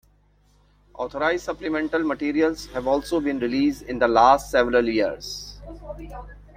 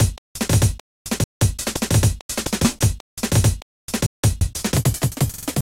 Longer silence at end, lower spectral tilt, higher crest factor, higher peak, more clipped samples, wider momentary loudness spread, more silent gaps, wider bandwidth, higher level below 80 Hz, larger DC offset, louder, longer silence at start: about the same, 0.15 s vs 0.05 s; about the same, -4.5 dB/octave vs -4.5 dB/octave; about the same, 20 dB vs 16 dB; about the same, -2 dBFS vs -4 dBFS; neither; first, 21 LU vs 9 LU; second, none vs 0.18-0.35 s, 0.80-1.05 s, 1.24-1.40 s, 2.21-2.29 s, 3.00-3.17 s, 3.62-3.88 s, 4.06-4.23 s; about the same, 16 kHz vs 17 kHz; second, -46 dBFS vs -30 dBFS; neither; about the same, -22 LUFS vs -21 LUFS; first, 0.95 s vs 0 s